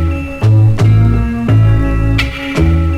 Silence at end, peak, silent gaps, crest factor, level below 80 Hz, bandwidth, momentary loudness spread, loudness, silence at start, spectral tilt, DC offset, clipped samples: 0 s; -2 dBFS; none; 8 dB; -18 dBFS; 7.8 kHz; 6 LU; -12 LUFS; 0 s; -7.5 dB/octave; under 0.1%; under 0.1%